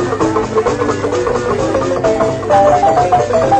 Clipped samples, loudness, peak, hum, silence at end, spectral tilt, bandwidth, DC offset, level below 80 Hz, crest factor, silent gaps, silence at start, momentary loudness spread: under 0.1%; -13 LUFS; 0 dBFS; none; 0 s; -6 dB/octave; 9.4 kHz; under 0.1%; -36 dBFS; 12 dB; none; 0 s; 5 LU